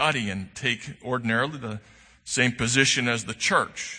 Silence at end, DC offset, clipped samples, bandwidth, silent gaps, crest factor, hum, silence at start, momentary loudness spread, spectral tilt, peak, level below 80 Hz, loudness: 0 s; under 0.1%; under 0.1%; 9.8 kHz; none; 22 dB; none; 0 s; 13 LU; -3 dB/octave; -4 dBFS; -56 dBFS; -24 LUFS